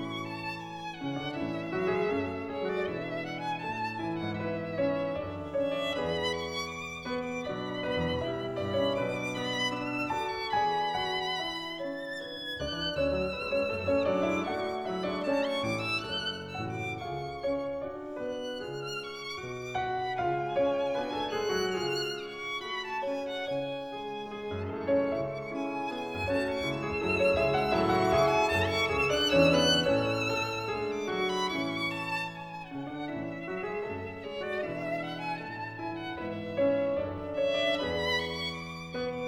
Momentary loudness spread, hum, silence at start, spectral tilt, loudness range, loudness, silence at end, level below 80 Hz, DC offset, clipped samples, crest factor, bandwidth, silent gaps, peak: 10 LU; none; 0 s; -5 dB/octave; 8 LU; -31 LUFS; 0 s; -56 dBFS; under 0.1%; under 0.1%; 20 dB; 19 kHz; none; -12 dBFS